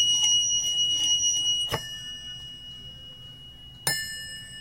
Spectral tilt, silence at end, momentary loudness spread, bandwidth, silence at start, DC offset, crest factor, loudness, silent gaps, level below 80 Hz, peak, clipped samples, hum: 1 dB/octave; 0 s; 22 LU; 16 kHz; 0 s; under 0.1%; 18 dB; -23 LUFS; none; -54 dBFS; -10 dBFS; under 0.1%; none